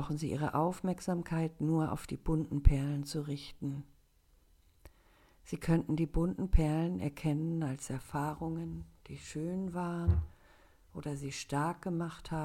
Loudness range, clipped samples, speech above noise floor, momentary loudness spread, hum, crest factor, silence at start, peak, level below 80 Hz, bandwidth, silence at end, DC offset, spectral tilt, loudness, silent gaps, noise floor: 4 LU; under 0.1%; 34 dB; 11 LU; none; 26 dB; 0 s; -8 dBFS; -40 dBFS; 15.5 kHz; 0 s; under 0.1%; -7 dB/octave; -35 LUFS; none; -67 dBFS